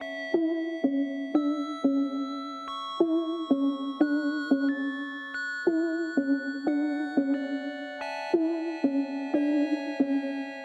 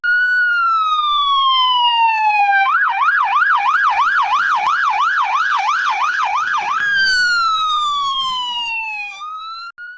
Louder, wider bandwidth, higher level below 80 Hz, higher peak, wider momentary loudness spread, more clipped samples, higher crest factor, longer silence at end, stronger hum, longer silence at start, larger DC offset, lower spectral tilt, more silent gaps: second, -29 LUFS vs -15 LUFS; about the same, 7.8 kHz vs 8 kHz; second, -82 dBFS vs -56 dBFS; second, -10 dBFS vs -6 dBFS; about the same, 8 LU vs 7 LU; neither; first, 18 dB vs 10 dB; about the same, 0 s vs 0 s; neither; about the same, 0 s vs 0.05 s; neither; first, -5 dB/octave vs 2 dB/octave; neither